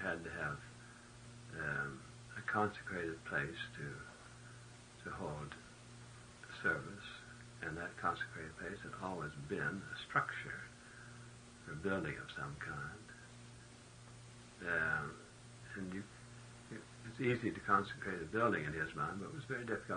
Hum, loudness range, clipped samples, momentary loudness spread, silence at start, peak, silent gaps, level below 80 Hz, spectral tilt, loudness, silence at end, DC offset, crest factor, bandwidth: none; 7 LU; under 0.1%; 19 LU; 0 s; -20 dBFS; none; -68 dBFS; -5.5 dB/octave; -42 LUFS; 0 s; under 0.1%; 24 dB; 10 kHz